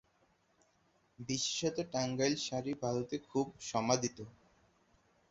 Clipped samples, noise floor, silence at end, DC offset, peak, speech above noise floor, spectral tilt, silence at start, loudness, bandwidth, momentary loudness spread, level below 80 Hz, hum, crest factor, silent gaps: under 0.1%; -73 dBFS; 1 s; under 0.1%; -14 dBFS; 37 dB; -4 dB/octave; 1.2 s; -36 LUFS; 8 kHz; 7 LU; -70 dBFS; none; 24 dB; none